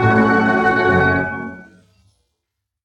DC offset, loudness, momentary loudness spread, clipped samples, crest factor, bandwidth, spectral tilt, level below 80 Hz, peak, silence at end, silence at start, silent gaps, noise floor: under 0.1%; -15 LUFS; 13 LU; under 0.1%; 16 dB; 9 kHz; -7.5 dB/octave; -48 dBFS; -2 dBFS; 1.2 s; 0 s; none; -78 dBFS